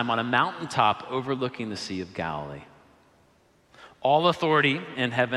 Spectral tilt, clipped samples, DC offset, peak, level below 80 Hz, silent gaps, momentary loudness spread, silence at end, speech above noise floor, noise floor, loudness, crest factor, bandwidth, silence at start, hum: -5.5 dB/octave; under 0.1%; under 0.1%; -6 dBFS; -62 dBFS; none; 11 LU; 0 s; 36 dB; -62 dBFS; -25 LUFS; 20 dB; 12.5 kHz; 0 s; none